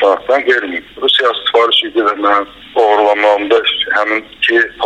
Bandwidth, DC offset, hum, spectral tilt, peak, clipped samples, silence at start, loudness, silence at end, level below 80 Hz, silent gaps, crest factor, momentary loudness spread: 10.5 kHz; under 0.1%; none; -2.5 dB/octave; 0 dBFS; under 0.1%; 0 s; -12 LUFS; 0 s; -52 dBFS; none; 12 dB; 5 LU